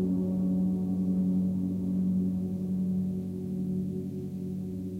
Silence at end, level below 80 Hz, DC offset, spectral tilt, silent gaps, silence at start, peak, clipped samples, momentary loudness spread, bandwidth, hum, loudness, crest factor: 0 s; -58 dBFS; under 0.1%; -11 dB/octave; none; 0 s; -20 dBFS; under 0.1%; 7 LU; 1.3 kHz; none; -30 LUFS; 10 dB